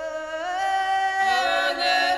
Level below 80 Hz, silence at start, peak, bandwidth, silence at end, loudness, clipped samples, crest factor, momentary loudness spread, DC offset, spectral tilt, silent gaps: -60 dBFS; 0 s; -10 dBFS; 14 kHz; 0 s; -23 LUFS; under 0.1%; 14 dB; 8 LU; under 0.1%; -0.5 dB/octave; none